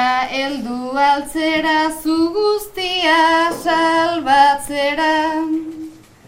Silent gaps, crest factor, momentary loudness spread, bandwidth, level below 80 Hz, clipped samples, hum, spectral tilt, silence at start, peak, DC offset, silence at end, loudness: none; 16 dB; 10 LU; 16.5 kHz; -50 dBFS; under 0.1%; none; -3 dB/octave; 0 s; 0 dBFS; under 0.1%; 0.3 s; -16 LUFS